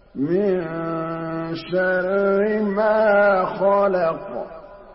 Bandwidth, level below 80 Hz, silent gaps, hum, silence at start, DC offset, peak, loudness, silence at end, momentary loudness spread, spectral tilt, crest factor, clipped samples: 5.8 kHz; -54 dBFS; none; none; 0.15 s; under 0.1%; -8 dBFS; -20 LUFS; 0 s; 12 LU; -11.5 dB/octave; 12 dB; under 0.1%